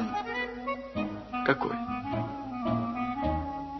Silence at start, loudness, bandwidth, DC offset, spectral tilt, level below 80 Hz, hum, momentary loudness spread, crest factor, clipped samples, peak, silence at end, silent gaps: 0 s; -32 LUFS; 6 kHz; under 0.1%; -5 dB/octave; -48 dBFS; none; 7 LU; 22 dB; under 0.1%; -10 dBFS; 0 s; none